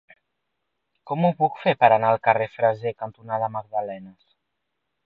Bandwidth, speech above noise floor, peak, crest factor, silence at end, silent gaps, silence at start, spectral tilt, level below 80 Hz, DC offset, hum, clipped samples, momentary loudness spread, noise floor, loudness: 5.2 kHz; 57 dB; -2 dBFS; 24 dB; 0.95 s; none; 1.05 s; -9 dB/octave; -70 dBFS; under 0.1%; none; under 0.1%; 14 LU; -79 dBFS; -22 LUFS